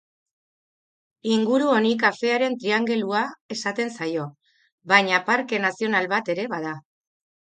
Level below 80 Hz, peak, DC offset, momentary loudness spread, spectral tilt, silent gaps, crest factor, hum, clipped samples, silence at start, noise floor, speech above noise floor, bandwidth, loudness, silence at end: -74 dBFS; -2 dBFS; under 0.1%; 11 LU; -4.5 dB/octave; 3.41-3.49 s, 4.72-4.78 s; 22 dB; none; under 0.1%; 1.25 s; under -90 dBFS; over 67 dB; 9.2 kHz; -22 LUFS; 0.65 s